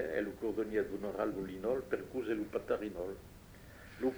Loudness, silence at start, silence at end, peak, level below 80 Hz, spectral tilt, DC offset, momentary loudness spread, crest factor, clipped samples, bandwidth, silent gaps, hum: -38 LUFS; 0 s; 0 s; -20 dBFS; -60 dBFS; -6.5 dB/octave; under 0.1%; 17 LU; 18 dB; under 0.1%; over 20 kHz; none; none